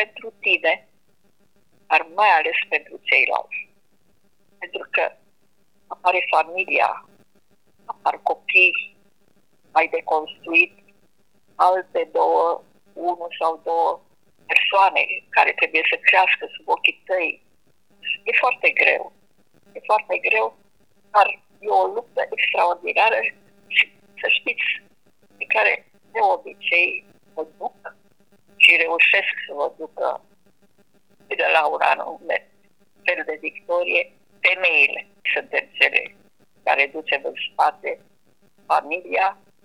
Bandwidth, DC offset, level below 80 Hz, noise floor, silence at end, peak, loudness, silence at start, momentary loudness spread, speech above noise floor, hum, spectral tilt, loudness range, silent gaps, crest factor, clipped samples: 14 kHz; 0.1%; -78 dBFS; -66 dBFS; 0.3 s; 0 dBFS; -19 LUFS; 0 s; 15 LU; 46 dB; none; -2 dB/octave; 5 LU; none; 22 dB; under 0.1%